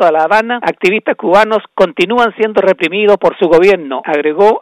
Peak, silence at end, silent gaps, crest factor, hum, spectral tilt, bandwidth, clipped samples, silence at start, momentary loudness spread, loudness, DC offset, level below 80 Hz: 0 dBFS; 0 s; none; 10 dB; none; -5.5 dB/octave; 12 kHz; under 0.1%; 0 s; 6 LU; -11 LUFS; under 0.1%; -48 dBFS